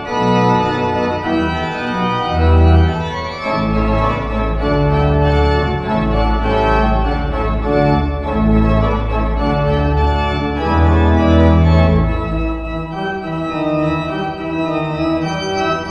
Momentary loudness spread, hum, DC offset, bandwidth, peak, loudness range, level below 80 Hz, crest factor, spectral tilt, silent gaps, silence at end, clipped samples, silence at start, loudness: 8 LU; none; under 0.1%; 7.4 kHz; 0 dBFS; 3 LU; -20 dBFS; 14 dB; -7.5 dB/octave; none; 0 s; under 0.1%; 0 s; -16 LUFS